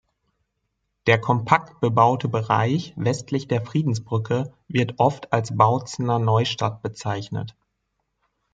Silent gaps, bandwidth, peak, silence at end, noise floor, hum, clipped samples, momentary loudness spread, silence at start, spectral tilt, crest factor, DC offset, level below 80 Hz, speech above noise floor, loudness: none; 7.8 kHz; -2 dBFS; 1.05 s; -76 dBFS; none; under 0.1%; 9 LU; 1.05 s; -6.5 dB/octave; 20 dB; under 0.1%; -60 dBFS; 54 dB; -22 LUFS